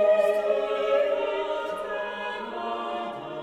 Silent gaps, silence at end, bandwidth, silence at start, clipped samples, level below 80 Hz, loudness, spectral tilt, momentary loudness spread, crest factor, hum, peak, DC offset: none; 0 s; 12.5 kHz; 0 s; under 0.1%; -64 dBFS; -27 LUFS; -4 dB/octave; 9 LU; 14 dB; none; -12 dBFS; under 0.1%